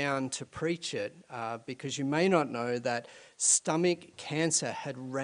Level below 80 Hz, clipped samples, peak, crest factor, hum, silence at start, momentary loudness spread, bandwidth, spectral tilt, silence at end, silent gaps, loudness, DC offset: -74 dBFS; under 0.1%; -10 dBFS; 20 dB; none; 0 s; 13 LU; 10.5 kHz; -3.5 dB/octave; 0 s; none; -31 LUFS; under 0.1%